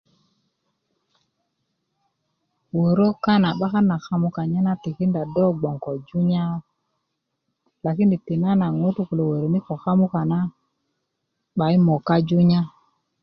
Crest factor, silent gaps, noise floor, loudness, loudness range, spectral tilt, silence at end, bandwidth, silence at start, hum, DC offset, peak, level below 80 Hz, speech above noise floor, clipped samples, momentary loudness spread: 16 dB; none; -78 dBFS; -21 LUFS; 3 LU; -9.5 dB/octave; 0.55 s; 6 kHz; 2.75 s; none; under 0.1%; -6 dBFS; -60 dBFS; 57 dB; under 0.1%; 9 LU